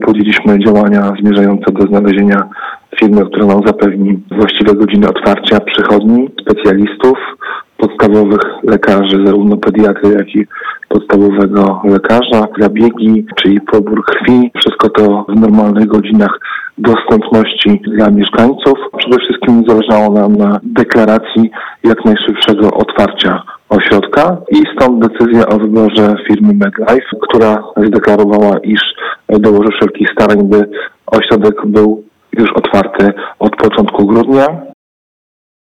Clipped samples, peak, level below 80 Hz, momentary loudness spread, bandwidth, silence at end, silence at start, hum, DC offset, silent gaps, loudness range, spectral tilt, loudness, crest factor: under 0.1%; 0 dBFS; -42 dBFS; 5 LU; 7.2 kHz; 1 s; 0 s; none; under 0.1%; none; 1 LU; -7.5 dB/octave; -9 LUFS; 8 dB